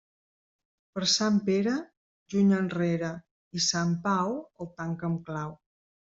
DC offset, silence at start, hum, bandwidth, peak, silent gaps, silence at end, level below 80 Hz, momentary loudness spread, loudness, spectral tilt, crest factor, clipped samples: under 0.1%; 0.95 s; none; 7.8 kHz; -12 dBFS; 1.97-2.26 s, 3.31-3.51 s; 0.45 s; -66 dBFS; 14 LU; -28 LUFS; -4.5 dB/octave; 18 dB; under 0.1%